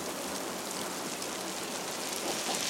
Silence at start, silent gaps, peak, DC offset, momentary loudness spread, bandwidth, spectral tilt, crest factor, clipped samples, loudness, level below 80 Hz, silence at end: 0 s; none; -16 dBFS; under 0.1%; 3 LU; 16.5 kHz; -1.5 dB/octave; 20 dB; under 0.1%; -35 LUFS; -72 dBFS; 0 s